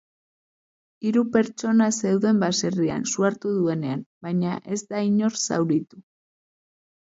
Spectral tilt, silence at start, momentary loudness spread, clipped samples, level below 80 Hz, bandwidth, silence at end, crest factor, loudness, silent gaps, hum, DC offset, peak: -5 dB/octave; 1 s; 8 LU; under 0.1%; -64 dBFS; 8 kHz; 1.2 s; 18 dB; -23 LUFS; 4.06-4.21 s; none; under 0.1%; -8 dBFS